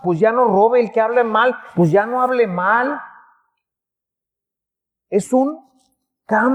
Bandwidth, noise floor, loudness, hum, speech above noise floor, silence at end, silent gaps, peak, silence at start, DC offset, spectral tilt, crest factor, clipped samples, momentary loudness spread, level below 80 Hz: 12 kHz; -84 dBFS; -16 LUFS; none; 69 dB; 0 s; none; -2 dBFS; 0.05 s; under 0.1%; -7 dB/octave; 16 dB; under 0.1%; 8 LU; -66 dBFS